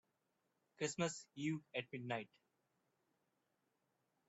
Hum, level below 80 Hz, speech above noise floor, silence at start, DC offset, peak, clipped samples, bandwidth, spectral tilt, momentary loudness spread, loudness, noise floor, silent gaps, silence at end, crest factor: none; -86 dBFS; 41 dB; 0.8 s; under 0.1%; -26 dBFS; under 0.1%; 8 kHz; -4.5 dB/octave; 6 LU; -45 LUFS; -86 dBFS; none; 2.05 s; 22 dB